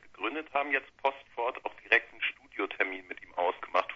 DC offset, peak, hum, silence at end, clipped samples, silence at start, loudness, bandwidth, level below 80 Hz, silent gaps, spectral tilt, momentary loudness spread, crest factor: under 0.1%; -8 dBFS; none; 0 s; under 0.1%; 0.05 s; -32 LUFS; 7.6 kHz; -72 dBFS; none; -3.5 dB/octave; 10 LU; 24 dB